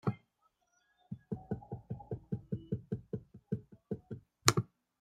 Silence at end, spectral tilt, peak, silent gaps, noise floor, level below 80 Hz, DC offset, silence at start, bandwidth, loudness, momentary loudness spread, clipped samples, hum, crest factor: 0.35 s; -4 dB/octave; 0 dBFS; none; -77 dBFS; -64 dBFS; under 0.1%; 0.05 s; 16 kHz; -39 LUFS; 19 LU; under 0.1%; none; 40 dB